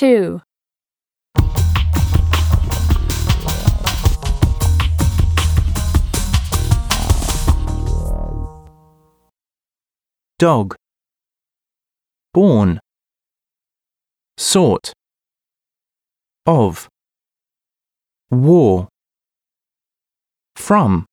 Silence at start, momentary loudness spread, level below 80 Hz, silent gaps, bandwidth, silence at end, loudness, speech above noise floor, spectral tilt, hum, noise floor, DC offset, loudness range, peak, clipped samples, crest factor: 0 s; 11 LU; -22 dBFS; none; over 20 kHz; 0.1 s; -16 LUFS; over 77 dB; -6 dB/octave; none; under -90 dBFS; under 0.1%; 6 LU; 0 dBFS; under 0.1%; 16 dB